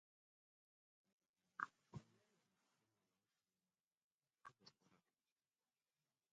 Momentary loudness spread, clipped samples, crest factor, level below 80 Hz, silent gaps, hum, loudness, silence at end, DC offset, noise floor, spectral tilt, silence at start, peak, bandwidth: 15 LU; under 0.1%; 38 dB; under -90 dBFS; 3.87-3.91 s, 3.97-4.21 s; none; -56 LUFS; 1.35 s; under 0.1%; under -90 dBFS; -3.5 dB/octave; 1.6 s; -28 dBFS; 7.6 kHz